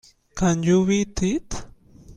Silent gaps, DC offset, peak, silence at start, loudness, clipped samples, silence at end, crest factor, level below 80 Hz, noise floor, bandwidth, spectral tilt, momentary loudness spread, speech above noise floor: none; under 0.1%; -8 dBFS; 0.35 s; -22 LUFS; under 0.1%; 0.05 s; 16 dB; -40 dBFS; -46 dBFS; 10 kHz; -6 dB/octave; 17 LU; 26 dB